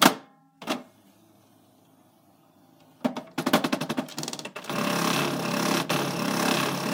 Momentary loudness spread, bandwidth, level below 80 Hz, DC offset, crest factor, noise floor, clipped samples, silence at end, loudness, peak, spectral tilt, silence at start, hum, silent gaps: 9 LU; 18 kHz; -72 dBFS; under 0.1%; 26 dB; -60 dBFS; under 0.1%; 0 s; -27 LUFS; -2 dBFS; -3.5 dB/octave; 0 s; none; none